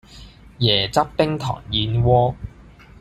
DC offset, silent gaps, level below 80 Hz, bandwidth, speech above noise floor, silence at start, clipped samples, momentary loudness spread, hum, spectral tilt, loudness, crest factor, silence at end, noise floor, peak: under 0.1%; none; -40 dBFS; 13 kHz; 26 dB; 0.1 s; under 0.1%; 9 LU; none; -6 dB/octave; -19 LUFS; 18 dB; 0.5 s; -45 dBFS; -2 dBFS